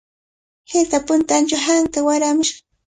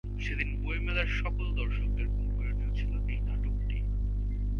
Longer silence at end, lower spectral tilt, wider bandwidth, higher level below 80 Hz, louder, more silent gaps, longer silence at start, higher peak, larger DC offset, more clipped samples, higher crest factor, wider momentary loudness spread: first, 0.3 s vs 0 s; second, -2 dB/octave vs -7 dB/octave; first, 9.6 kHz vs 6.2 kHz; second, -52 dBFS vs -30 dBFS; first, -17 LUFS vs -33 LUFS; neither; first, 0.7 s vs 0.05 s; first, -4 dBFS vs -16 dBFS; neither; neither; about the same, 16 dB vs 14 dB; about the same, 3 LU vs 3 LU